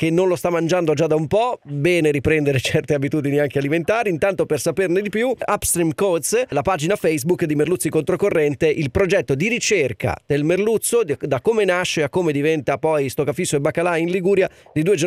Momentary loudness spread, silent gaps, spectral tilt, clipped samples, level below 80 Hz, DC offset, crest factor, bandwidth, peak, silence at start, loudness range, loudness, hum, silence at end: 3 LU; none; -5 dB/octave; under 0.1%; -46 dBFS; under 0.1%; 14 dB; 16 kHz; -4 dBFS; 0 s; 1 LU; -19 LUFS; none; 0 s